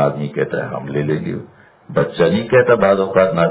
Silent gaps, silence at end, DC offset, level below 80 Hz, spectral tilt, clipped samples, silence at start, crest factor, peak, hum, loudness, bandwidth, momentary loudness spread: none; 0 s; under 0.1%; -48 dBFS; -11 dB/octave; under 0.1%; 0 s; 16 dB; 0 dBFS; none; -16 LUFS; 4 kHz; 10 LU